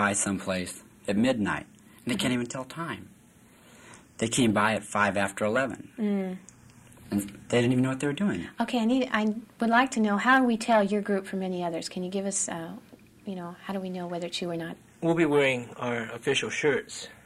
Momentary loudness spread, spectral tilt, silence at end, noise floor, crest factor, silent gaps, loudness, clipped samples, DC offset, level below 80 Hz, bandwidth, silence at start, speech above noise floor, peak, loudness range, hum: 14 LU; -4.5 dB/octave; 0.1 s; -56 dBFS; 18 dB; none; -28 LUFS; under 0.1%; under 0.1%; -64 dBFS; 14 kHz; 0 s; 29 dB; -10 dBFS; 7 LU; none